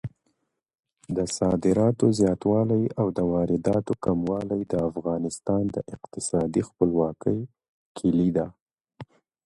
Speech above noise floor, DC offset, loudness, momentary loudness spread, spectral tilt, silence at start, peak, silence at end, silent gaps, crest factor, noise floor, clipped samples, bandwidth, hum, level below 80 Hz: 49 dB; under 0.1%; -25 LUFS; 10 LU; -7 dB/octave; 0.05 s; -6 dBFS; 0.4 s; 7.69-7.95 s, 8.61-8.66 s; 18 dB; -74 dBFS; under 0.1%; 11.5 kHz; none; -52 dBFS